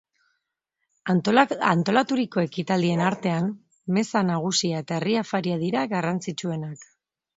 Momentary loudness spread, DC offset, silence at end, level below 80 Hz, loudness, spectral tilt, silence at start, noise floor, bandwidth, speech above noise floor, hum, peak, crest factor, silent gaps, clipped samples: 10 LU; under 0.1%; 0.55 s; -68 dBFS; -24 LUFS; -5.5 dB/octave; 1.05 s; -80 dBFS; 8 kHz; 57 dB; none; -2 dBFS; 24 dB; none; under 0.1%